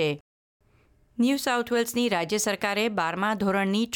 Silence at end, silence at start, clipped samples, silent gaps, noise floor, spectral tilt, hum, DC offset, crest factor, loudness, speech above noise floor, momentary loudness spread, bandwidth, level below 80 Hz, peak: 0 s; 0 s; under 0.1%; 0.21-0.60 s; -62 dBFS; -4 dB/octave; none; under 0.1%; 14 dB; -25 LUFS; 36 dB; 3 LU; 19 kHz; -64 dBFS; -12 dBFS